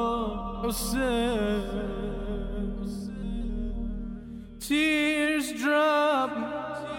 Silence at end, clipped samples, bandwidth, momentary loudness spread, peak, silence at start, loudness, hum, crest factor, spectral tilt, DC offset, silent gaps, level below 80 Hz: 0 s; under 0.1%; 17 kHz; 12 LU; -14 dBFS; 0 s; -28 LUFS; none; 14 dB; -4.5 dB/octave; under 0.1%; none; -38 dBFS